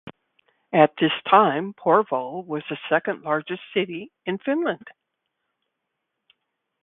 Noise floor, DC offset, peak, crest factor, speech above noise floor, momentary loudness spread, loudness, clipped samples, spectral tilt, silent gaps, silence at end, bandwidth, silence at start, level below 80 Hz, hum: -80 dBFS; under 0.1%; 0 dBFS; 24 dB; 58 dB; 13 LU; -23 LUFS; under 0.1%; -9.5 dB/octave; none; 1.95 s; 4.1 kHz; 0.05 s; -68 dBFS; none